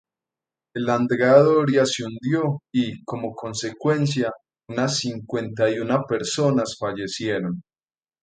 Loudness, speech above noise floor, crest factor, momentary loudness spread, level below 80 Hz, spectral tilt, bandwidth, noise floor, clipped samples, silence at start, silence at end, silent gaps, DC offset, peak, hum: -22 LUFS; over 68 dB; 22 dB; 12 LU; -62 dBFS; -5.5 dB/octave; 9.4 kHz; under -90 dBFS; under 0.1%; 0.75 s; 0.6 s; none; under 0.1%; -2 dBFS; none